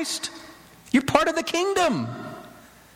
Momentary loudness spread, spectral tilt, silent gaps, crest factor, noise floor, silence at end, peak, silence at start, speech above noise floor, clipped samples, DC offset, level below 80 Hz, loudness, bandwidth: 18 LU; -4 dB/octave; none; 20 dB; -48 dBFS; 0.35 s; -6 dBFS; 0 s; 25 dB; under 0.1%; under 0.1%; -56 dBFS; -24 LUFS; 17 kHz